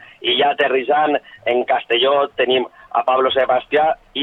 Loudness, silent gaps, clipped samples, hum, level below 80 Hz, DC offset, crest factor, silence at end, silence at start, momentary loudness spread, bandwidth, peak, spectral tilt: -17 LUFS; none; under 0.1%; none; -58 dBFS; under 0.1%; 12 dB; 0 s; 0.2 s; 5 LU; 4.1 kHz; -4 dBFS; -5.5 dB/octave